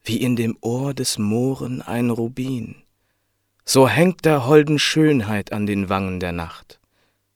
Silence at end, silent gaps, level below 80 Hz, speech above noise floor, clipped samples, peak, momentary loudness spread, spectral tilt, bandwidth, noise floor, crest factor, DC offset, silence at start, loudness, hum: 0.75 s; none; -52 dBFS; 50 dB; under 0.1%; 0 dBFS; 12 LU; -5 dB/octave; 18 kHz; -70 dBFS; 20 dB; under 0.1%; 0.05 s; -19 LUFS; none